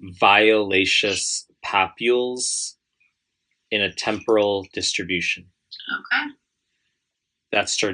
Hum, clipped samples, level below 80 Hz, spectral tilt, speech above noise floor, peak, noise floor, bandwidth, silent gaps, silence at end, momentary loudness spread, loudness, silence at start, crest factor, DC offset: none; under 0.1%; -66 dBFS; -2 dB/octave; 59 dB; -2 dBFS; -80 dBFS; 10.5 kHz; none; 0 s; 12 LU; -21 LUFS; 0 s; 22 dB; under 0.1%